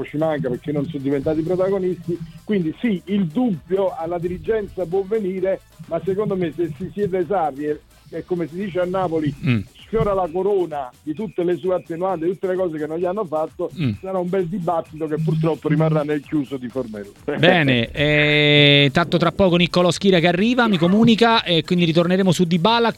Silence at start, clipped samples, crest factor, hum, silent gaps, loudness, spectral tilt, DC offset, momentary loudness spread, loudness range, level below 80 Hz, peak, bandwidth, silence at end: 0 s; under 0.1%; 20 dB; none; none; -20 LUFS; -6.5 dB/octave; under 0.1%; 12 LU; 8 LU; -46 dBFS; 0 dBFS; 13.5 kHz; 0 s